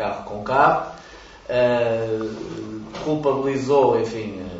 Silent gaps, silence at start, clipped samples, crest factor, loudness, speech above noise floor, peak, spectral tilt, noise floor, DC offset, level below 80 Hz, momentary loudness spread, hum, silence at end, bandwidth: none; 0 s; under 0.1%; 18 dB; -21 LUFS; 22 dB; -4 dBFS; -6.5 dB/octave; -43 dBFS; under 0.1%; -50 dBFS; 15 LU; none; 0 s; 8 kHz